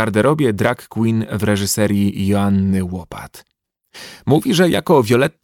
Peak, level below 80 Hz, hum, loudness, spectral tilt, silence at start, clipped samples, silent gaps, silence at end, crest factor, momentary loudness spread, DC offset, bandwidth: -2 dBFS; -50 dBFS; none; -16 LUFS; -5.5 dB/octave; 0 s; under 0.1%; none; 0.15 s; 16 dB; 17 LU; under 0.1%; 17.5 kHz